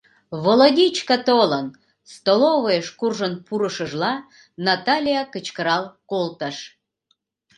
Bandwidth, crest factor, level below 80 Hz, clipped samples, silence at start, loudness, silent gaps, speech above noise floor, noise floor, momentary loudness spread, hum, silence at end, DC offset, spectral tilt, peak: 11.5 kHz; 20 dB; -68 dBFS; under 0.1%; 0.3 s; -20 LUFS; none; 49 dB; -69 dBFS; 14 LU; none; 0.9 s; under 0.1%; -4.5 dB/octave; 0 dBFS